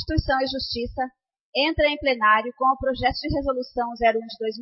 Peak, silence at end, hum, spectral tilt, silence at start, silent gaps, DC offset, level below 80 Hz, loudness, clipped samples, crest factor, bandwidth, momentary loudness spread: -6 dBFS; 0 s; none; -8 dB/octave; 0 s; 1.41-1.53 s; under 0.1%; -38 dBFS; -23 LUFS; under 0.1%; 18 dB; 6 kHz; 10 LU